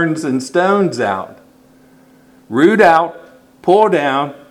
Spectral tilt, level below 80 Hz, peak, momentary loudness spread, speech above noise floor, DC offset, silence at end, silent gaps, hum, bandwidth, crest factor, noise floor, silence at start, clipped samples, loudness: -6 dB/octave; -58 dBFS; 0 dBFS; 12 LU; 34 dB; under 0.1%; 0.15 s; none; none; 12.5 kHz; 16 dB; -47 dBFS; 0 s; under 0.1%; -14 LUFS